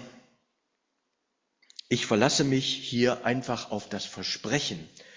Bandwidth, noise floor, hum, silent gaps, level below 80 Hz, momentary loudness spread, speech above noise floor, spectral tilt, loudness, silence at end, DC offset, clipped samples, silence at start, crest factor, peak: 7.6 kHz; -79 dBFS; none; none; -64 dBFS; 12 LU; 51 dB; -4 dB/octave; -27 LUFS; 0 s; under 0.1%; under 0.1%; 0 s; 24 dB; -6 dBFS